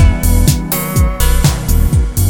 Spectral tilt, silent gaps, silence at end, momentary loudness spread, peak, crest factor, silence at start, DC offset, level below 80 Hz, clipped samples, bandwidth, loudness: -5 dB/octave; none; 0 s; 3 LU; 0 dBFS; 10 dB; 0 s; under 0.1%; -14 dBFS; under 0.1%; 17.5 kHz; -13 LUFS